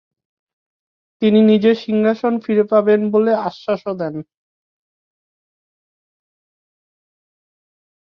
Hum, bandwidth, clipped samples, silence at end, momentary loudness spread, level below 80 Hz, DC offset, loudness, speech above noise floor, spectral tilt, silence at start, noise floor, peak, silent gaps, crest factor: none; 6 kHz; under 0.1%; 3.9 s; 11 LU; -66 dBFS; under 0.1%; -16 LUFS; over 75 dB; -8.5 dB/octave; 1.2 s; under -90 dBFS; -2 dBFS; none; 18 dB